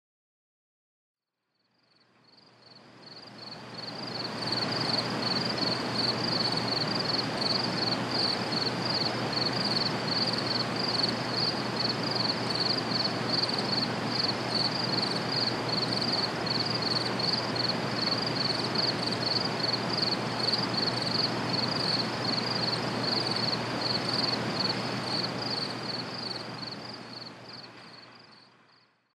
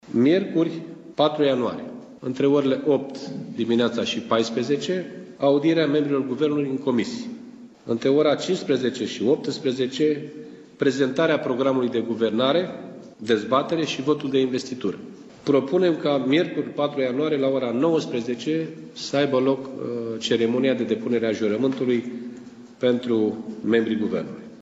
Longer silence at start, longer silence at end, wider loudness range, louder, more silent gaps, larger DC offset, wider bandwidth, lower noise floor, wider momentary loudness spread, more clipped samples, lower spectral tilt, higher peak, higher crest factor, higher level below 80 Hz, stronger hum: first, 2.7 s vs 0.05 s; first, 0.75 s vs 0 s; first, 6 LU vs 1 LU; second, -28 LUFS vs -23 LUFS; neither; neither; first, 13 kHz vs 8 kHz; first, -80 dBFS vs -43 dBFS; second, 10 LU vs 14 LU; neither; second, -4 dB/octave vs -6 dB/octave; second, -14 dBFS vs -6 dBFS; about the same, 18 dB vs 16 dB; about the same, -64 dBFS vs -68 dBFS; neither